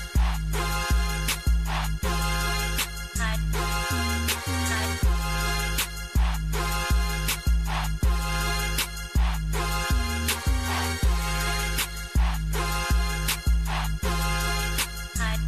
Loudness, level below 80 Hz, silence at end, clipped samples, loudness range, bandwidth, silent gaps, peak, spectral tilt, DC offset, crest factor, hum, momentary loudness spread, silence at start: -27 LUFS; -28 dBFS; 0 s; under 0.1%; 0 LU; 15 kHz; none; -12 dBFS; -3.5 dB/octave; under 0.1%; 14 dB; none; 3 LU; 0 s